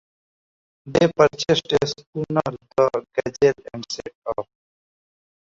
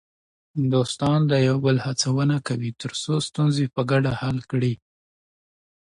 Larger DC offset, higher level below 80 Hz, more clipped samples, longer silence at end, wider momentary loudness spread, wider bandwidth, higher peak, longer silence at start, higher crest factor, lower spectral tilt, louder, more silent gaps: neither; about the same, -54 dBFS vs -56 dBFS; neither; about the same, 1.15 s vs 1.15 s; first, 14 LU vs 8 LU; second, 7.8 kHz vs 11 kHz; first, -2 dBFS vs -8 dBFS; first, 0.85 s vs 0.55 s; about the same, 20 dB vs 16 dB; about the same, -5 dB/octave vs -6 dB/octave; about the same, -22 LUFS vs -23 LUFS; first, 2.06-2.13 s, 4.15-4.22 s vs none